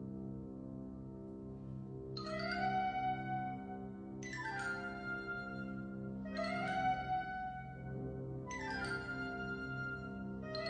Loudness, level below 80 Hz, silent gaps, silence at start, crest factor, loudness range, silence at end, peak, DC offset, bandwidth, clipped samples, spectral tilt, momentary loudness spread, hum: -42 LUFS; -60 dBFS; none; 0 s; 16 dB; 2 LU; 0 s; -26 dBFS; under 0.1%; 9.6 kHz; under 0.1%; -6 dB/octave; 11 LU; 50 Hz at -65 dBFS